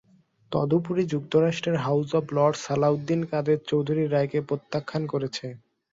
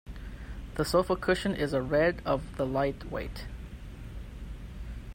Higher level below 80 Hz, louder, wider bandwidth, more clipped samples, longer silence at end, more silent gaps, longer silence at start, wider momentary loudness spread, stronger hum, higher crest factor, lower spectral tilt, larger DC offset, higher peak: second, -64 dBFS vs -42 dBFS; first, -26 LUFS vs -30 LUFS; second, 7.8 kHz vs 16 kHz; neither; first, 0.35 s vs 0 s; neither; first, 0.5 s vs 0.05 s; second, 7 LU vs 18 LU; neither; about the same, 18 dB vs 18 dB; about the same, -7 dB/octave vs -6 dB/octave; neither; first, -8 dBFS vs -12 dBFS